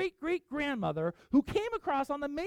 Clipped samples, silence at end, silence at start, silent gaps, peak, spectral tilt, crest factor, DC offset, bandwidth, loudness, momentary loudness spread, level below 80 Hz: under 0.1%; 0 s; 0 s; none; -16 dBFS; -6.5 dB/octave; 16 dB; under 0.1%; 13 kHz; -33 LUFS; 6 LU; -56 dBFS